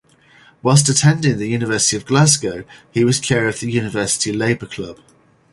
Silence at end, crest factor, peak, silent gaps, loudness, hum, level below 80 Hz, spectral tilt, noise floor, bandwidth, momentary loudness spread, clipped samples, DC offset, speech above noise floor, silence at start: 0.6 s; 18 dB; 0 dBFS; none; -16 LUFS; none; -50 dBFS; -4 dB/octave; -49 dBFS; 11.5 kHz; 13 LU; under 0.1%; under 0.1%; 33 dB; 0.65 s